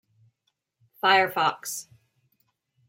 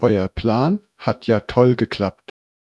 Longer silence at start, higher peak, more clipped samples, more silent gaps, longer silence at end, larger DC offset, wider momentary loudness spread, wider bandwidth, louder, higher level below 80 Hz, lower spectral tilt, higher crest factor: first, 1.05 s vs 0 s; second, -4 dBFS vs 0 dBFS; neither; neither; first, 1.05 s vs 0.65 s; neither; first, 14 LU vs 8 LU; first, 16.5 kHz vs 7.8 kHz; second, -24 LUFS vs -19 LUFS; second, -80 dBFS vs -44 dBFS; second, -2 dB/octave vs -8.5 dB/octave; about the same, 24 dB vs 20 dB